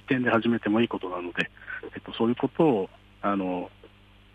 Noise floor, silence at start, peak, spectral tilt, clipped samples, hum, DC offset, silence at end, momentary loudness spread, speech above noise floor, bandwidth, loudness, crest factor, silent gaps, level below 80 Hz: -54 dBFS; 0.1 s; -10 dBFS; -7.5 dB/octave; under 0.1%; 50 Hz at -55 dBFS; under 0.1%; 0.5 s; 14 LU; 27 dB; 8.2 kHz; -27 LUFS; 18 dB; none; -60 dBFS